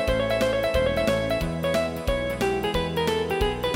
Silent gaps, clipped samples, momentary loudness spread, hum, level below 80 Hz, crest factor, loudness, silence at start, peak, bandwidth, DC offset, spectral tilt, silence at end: none; under 0.1%; 3 LU; none; -36 dBFS; 14 dB; -25 LUFS; 0 s; -10 dBFS; 17 kHz; under 0.1%; -5 dB/octave; 0 s